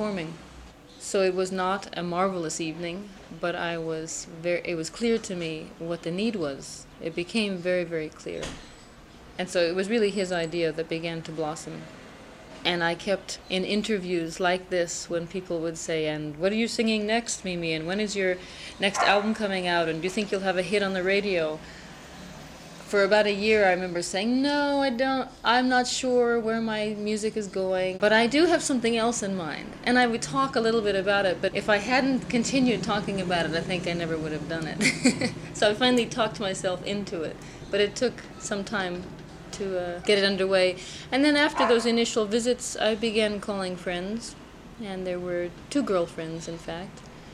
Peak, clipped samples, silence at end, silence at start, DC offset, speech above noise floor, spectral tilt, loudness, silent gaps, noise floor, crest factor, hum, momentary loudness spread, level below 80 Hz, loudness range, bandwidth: -6 dBFS; under 0.1%; 0 s; 0 s; under 0.1%; 22 dB; -4 dB/octave; -26 LUFS; none; -48 dBFS; 20 dB; none; 14 LU; -54 dBFS; 6 LU; 13.5 kHz